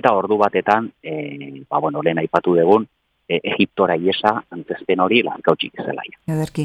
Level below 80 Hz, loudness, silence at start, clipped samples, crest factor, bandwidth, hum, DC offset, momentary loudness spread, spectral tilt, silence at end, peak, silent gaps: -60 dBFS; -19 LUFS; 0.05 s; under 0.1%; 18 dB; 12.5 kHz; none; under 0.1%; 12 LU; -6.5 dB/octave; 0 s; 0 dBFS; none